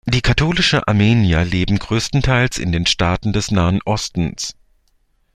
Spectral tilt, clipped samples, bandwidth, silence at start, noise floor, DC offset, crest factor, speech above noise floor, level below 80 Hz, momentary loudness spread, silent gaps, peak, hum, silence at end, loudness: -5 dB/octave; under 0.1%; 13 kHz; 0.05 s; -60 dBFS; under 0.1%; 16 dB; 44 dB; -32 dBFS; 7 LU; none; -2 dBFS; none; 0.85 s; -17 LUFS